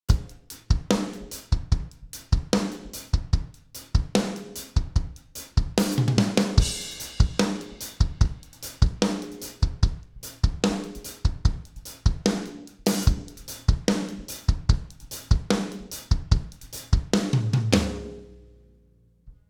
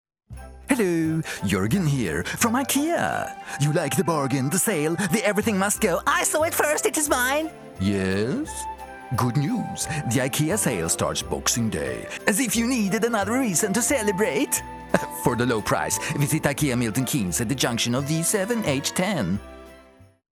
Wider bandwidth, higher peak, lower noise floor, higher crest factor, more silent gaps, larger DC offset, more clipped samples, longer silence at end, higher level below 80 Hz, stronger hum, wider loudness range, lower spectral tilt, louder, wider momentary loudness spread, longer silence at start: about the same, 20 kHz vs 19.5 kHz; about the same, -2 dBFS vs -2 dBFS; first, -59 dBFS vs -51 dBFS; about the same, 24 dB vs 22 dB; neither; neither; neither; about the same, 0.2 s vs 0.3 s; first, -28 dBFS vs -48 dBFS; neither; about the same, 3 LU vs 3 LU; first, -5.5 dB/octave vs -4 dB/octave; second, -26 LUFS vs -23 LUFS; first, 15 LU vs 6 LU; second, 0.1 s vs 0.3 s